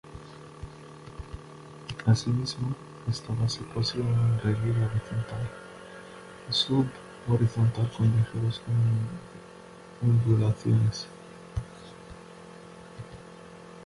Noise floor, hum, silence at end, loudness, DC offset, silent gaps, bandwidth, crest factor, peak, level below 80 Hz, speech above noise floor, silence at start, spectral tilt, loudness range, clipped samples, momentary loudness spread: -48 dBFS; none; 0 s; -28 LUFS; under 0.1%; none; 11.5 kHz; 18 dB; -10 dBFS; -50 dBFS; 22 dB; 0.05 s; -6.5 dB/octave; 4 LU; under 0.1%; 22 LU